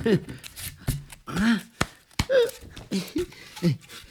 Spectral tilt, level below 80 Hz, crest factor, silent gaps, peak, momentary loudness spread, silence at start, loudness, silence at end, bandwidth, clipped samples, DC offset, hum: -5.5 dB/octave; -44 dBFS; 24 dB; none; -4 dBFS; 13 LU; 0 s; -28 LUFS; 0.05 s; 19.5 kHz; under 0.1%; under 0.1%; none